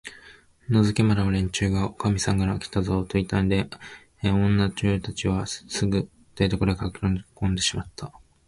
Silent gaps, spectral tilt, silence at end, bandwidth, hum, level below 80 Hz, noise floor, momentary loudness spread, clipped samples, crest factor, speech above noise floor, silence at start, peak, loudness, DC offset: none; -5.5 dB/octave; 0.4 s; 11.5 kHz; none; -40 dBFS; -52 dBFS; 14 LU; under 0.1%; 18 dB; 28 dB; 0.05 s; -6 dBFS; -25 LUFS; under 0.1%